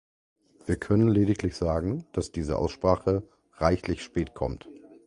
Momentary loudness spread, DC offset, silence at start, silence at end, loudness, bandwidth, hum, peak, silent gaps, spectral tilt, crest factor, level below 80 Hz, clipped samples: 10 LU; under 0.1%; 0.65 s; 0.3 s; -27 LUFS; 11.5 kHz; none; -6 dBFS; none; -7.5 dB/octave; 22 dB; -42 dBFS; under 0.1%